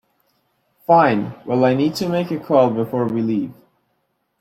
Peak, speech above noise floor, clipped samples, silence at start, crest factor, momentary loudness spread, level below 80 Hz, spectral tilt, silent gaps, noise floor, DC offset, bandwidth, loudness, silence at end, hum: -2 dBFS; 52 dB; under 0.1%; 0.9 s; 18 dB; 9 LU; -60 dBFS; -7 dB/octave; none; -69 dBFS; under 0.1%; 15.5 kHz; -18 LUFS; 0.9 s; none